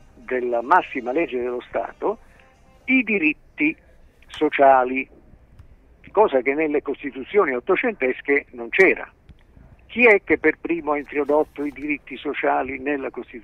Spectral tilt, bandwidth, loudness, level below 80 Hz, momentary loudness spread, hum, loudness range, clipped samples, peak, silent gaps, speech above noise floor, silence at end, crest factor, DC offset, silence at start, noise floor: -6.5 dB/octave; 8.8 kHz; -21 LUFS; -52 dBFS; 13 LU; none; 4 LU; under 0.1%; -4 dBFS; none; 31 dB; 0 s; 18 dB; under 0.1%; 0.3 s; -52 dBFS